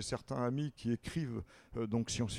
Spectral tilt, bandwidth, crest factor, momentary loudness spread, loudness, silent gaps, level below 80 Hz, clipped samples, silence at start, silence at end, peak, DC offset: -5.5 dB/octave; 13 kHz; 16 dB; 7 LU; -39 LUFS; none; -58 dBFS; under 0.1%; 0 s; 0 s; -22 dBFS; under 0.1%